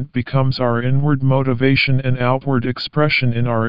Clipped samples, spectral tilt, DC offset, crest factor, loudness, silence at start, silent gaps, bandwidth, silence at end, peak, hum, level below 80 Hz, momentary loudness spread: under 0.1%; -9 dB/octave; 4%; 14 dB; -17 LUFS; 0 s; none; 5.4 kHz; 0 s; -2 dBFS; none; -42 dBFS; 4 LU